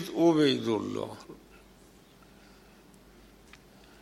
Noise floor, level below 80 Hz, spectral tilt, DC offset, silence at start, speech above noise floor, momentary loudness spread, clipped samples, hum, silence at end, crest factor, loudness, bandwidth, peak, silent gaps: -56 dBFS; -64 dBFS; -6 dB/octave; under 0.1%; 0 s; 30 dB; 26 LU; under 0.1%; none; 2.7 s; 20 dB; -27 LUFS; 13.5 kHz; -12 dBFS; none